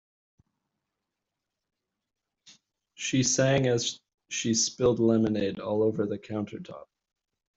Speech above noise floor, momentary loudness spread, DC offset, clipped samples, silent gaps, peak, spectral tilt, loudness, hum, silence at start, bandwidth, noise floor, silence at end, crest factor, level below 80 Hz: 60 dB; 15 LU; under 0.1%; under 0.1%; 4.14-4.18 s; -12 dBFS; -4.5 dB/octave; -27 LUFS; none; 3 s; 8.2 kHz; -86 dBFS; 0.75 s; 18 dB; -62 dBFS